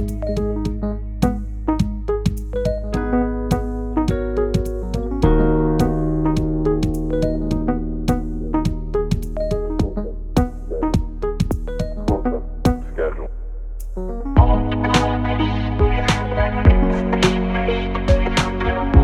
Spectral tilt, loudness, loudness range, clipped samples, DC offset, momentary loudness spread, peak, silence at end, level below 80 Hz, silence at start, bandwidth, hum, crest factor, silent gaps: -7 dB/octave; -21 LUFS; 5 LU; under 0.1%; under 0.1%; 8 LU; 0 dBFS; 0 s; -24 dBFS; 0 s; 14 kHz; none; 18 dB; none